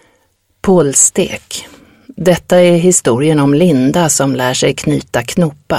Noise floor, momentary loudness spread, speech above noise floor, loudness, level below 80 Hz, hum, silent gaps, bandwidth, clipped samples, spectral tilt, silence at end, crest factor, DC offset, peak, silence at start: -58 dBFS; 9 LU; 47 dB; -11 LUFS; -42 dBFS; none; none; 17 kHz; under 0.1%; -4.5 dB/octave; 0 s; 12 dB; under 0.1%; 0 dBFS; 0.65 s